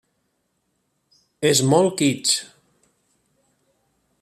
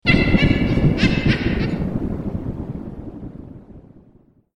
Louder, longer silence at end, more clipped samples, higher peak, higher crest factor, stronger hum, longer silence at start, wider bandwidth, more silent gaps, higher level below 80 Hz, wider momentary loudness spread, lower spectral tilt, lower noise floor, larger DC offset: about the same, -19 LUFS vs -20 LUFS; first, 1.75 s vs 0.75 s; neither; about the same, -4 dBFS vs -2 dBFS; about the same, 20 dB vs 20 dB; neither; first, 1.4 s vs 0.05 s; first, 14.5 kHz vs 11 kHz; neither; second, -64 dBFS vs -30 dBFS; second, 6 LU vs 19 LU; second, -4 dB/octave vs -7.5 dB/octave; first, -72 dBFS vs -53 dBFS; neither